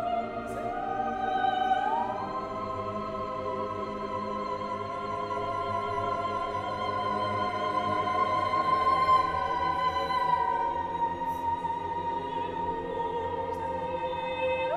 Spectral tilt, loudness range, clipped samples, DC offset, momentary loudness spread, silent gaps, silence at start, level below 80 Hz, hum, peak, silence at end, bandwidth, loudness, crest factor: -5.5 dB/octave; 6 LU; under 0.1%; under 0.1%; 7 LU; none; 0 s; -54 dBFS; none; -14 dBFS; 0 s; 13 kHz; -30 LUFS; 16 dB